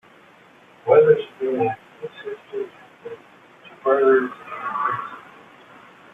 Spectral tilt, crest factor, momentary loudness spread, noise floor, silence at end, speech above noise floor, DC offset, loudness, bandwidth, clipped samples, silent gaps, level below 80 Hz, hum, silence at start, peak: -7.5 dB/octave; 20 dB; 23 LU; -51 dBFS; 0.95 s; 32 dB; under 0.1%; -21 LUFS; 3.9 kHz; under 0.1%; none; -68 dBFS; none; 0.85 s; -4 dBFS